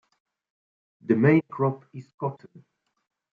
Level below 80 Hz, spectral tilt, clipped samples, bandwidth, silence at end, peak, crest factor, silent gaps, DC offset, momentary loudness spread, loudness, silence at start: -72 dBFS; -10.5 dB/octave; under 0.1%; 4.9 kHz; 1.05 s; -8 dBFS; 20 dB; 2.14-2.18 s; under 0.1%; 22 LU; -24 LUFS; 1.1 s